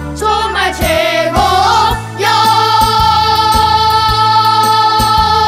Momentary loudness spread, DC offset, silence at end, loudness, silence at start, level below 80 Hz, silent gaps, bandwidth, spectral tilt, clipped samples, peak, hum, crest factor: 4 LU; under 0.1%; 0 s; -10 LUFS; 0 s; -26 dBFS; none; 16 kHz; -3.5 dB/octave; under 0.1%; 0 dBFS; none; 10 dB